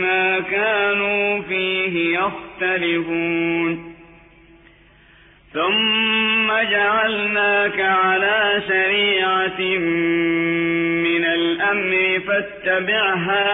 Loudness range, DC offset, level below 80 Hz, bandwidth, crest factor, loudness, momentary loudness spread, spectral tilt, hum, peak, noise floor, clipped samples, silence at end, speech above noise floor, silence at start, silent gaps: 6 LU; under 0.1%; -56 dBFS; 4 kHz; 12 dB; -18 LUFS; 5 LU; -7.5 dB/octave; none; -8 dBFS; -50 dBFS; under 0.1%; 0 s; 31 dB; 0 s; none